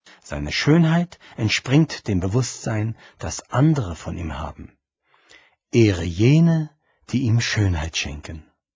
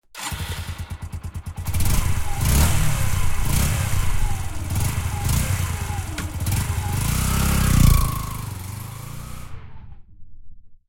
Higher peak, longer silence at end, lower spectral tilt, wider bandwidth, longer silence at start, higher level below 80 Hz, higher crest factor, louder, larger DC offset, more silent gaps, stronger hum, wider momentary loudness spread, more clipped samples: about the same, -4 dBFS vs -2 dBFS; first, 0.35 s vs 0.15 s; first, -6 dB/octave vs -4.5 dB/octave; second, 7.8 kHz vs 17 kHz; about the same, 0.25 s vs 0.15 s; second, -38 dBFS vs -26 dBFS; about the same, 18 dB vs 18 dB; about the same, -21 LUFS vs -23 LUFS; neither; neither; neither; about the same, 15 LU vs 15 LU; neither